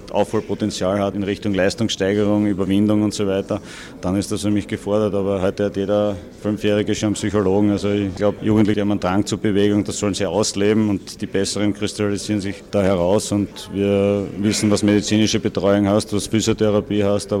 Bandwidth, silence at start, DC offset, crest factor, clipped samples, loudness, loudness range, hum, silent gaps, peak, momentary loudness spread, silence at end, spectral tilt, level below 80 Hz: 14.5 kHz; 0 s; under 0.1%; 14 dB; under 0.1%; -19 LUFS; 3 LU; none; none; -6 dBFS; 6 LU; 0 s; -5.5 dB/octave; -46 dBFS